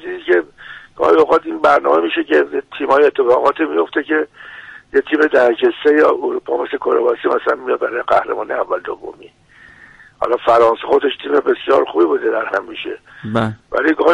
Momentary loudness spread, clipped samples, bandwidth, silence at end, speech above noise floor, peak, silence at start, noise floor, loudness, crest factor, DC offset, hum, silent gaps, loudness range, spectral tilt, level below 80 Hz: 14 LU; under 0.1%; 8.6 kHz; 0 s; 29 dB; -2 dBFS; 0 s; -44 dBFS; -15 LUFS; 14 dB; under 0.1%; none; none; 4 LU; -6.5 dB/octave; -54 dBFS